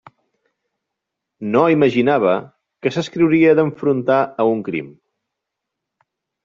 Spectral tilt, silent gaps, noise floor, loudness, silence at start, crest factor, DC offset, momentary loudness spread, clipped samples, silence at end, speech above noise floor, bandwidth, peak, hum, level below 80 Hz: -7.5 dB/octave; none; -81 dBFS; -17 LUFS; 1.4 s; 16 dB; under 0.1%; 12 LU; under 0.1%; 1.55 s; 65 dB; 7.4 kHz; -2 dBFS; none; -60 dBFS